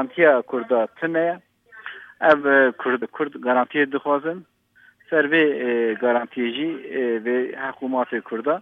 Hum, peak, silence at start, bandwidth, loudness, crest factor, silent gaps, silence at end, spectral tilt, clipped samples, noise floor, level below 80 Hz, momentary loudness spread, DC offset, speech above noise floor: none; -2 dBFS; 0 s; 5.2 kHz; -21 LUFS; 20 dB; none; 0 s; -7.5 dB/octave; under 0.1%; -56 dBFS; -74 dBFS; 11 LU; under 0.1%; 35 dB